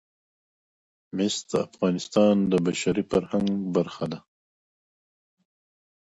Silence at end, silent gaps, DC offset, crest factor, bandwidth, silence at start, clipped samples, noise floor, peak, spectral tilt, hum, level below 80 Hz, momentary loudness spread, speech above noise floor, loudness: 1.85 s; none; under 0.1%; 20 dB; 9.4 kHz; 1.15 s; under 0.1%; under -90 dBFS; -8 dBFS; -5.5 dB/octave; none; -60 dBFS; 12 LU; over 66 dB; -25 LUFS